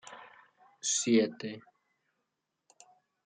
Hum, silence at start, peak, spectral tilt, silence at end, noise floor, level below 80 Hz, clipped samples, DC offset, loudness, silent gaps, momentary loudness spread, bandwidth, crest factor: none; 0.05 s; -14 dBFS; -3 dB/octave; 1.65 s; -84 dBFS; -86 dBFS; under 0.1%; under 0.1%; -30 LUFS; none; 23 LU; 9.6 kHz; 22 dB